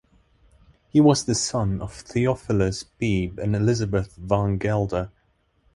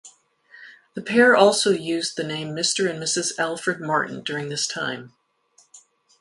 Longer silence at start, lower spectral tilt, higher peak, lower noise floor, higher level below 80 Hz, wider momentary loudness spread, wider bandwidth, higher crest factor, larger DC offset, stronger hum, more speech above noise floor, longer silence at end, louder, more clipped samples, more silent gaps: first, 0.95 s vs 0.05 s; first, -6 dB/octave vs -3 dB/octave; second, -4 dBFS vs 0 dBFS; first, -66 dBFS vs -60 dBFS; first, -42 dBFS vs -68 dBFS; second, 9 LU vs 13 LU; about the same, 11.5 kHz vs 11.5 kHz; about the same, 20 dB vs 22 dB; neither; neither; first, 43 dB vs 39 dB; first, 0.65 s vs 0.4 s; about the same, -23 LUFS vs -21 LUFS; neither; neither